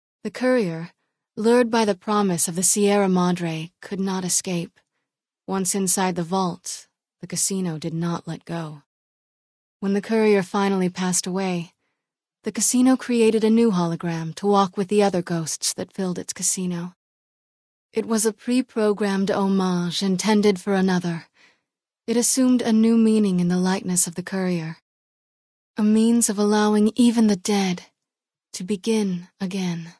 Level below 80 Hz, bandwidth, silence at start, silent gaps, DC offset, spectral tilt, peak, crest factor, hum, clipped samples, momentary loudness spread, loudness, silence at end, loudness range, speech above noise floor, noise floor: -66 dBFS; 11 kHz; 0.25 s; 8.86-9.80 s, 16.96-17.89 s, 24.82-25.74 s; under 0.1%; -4.5 dB/octave; -4 dBFS; 18 dB; none; under 0.1%; 13 LU; -21 LUFS; 0.1 s; 5 LU; 67 dB; -88 dBFS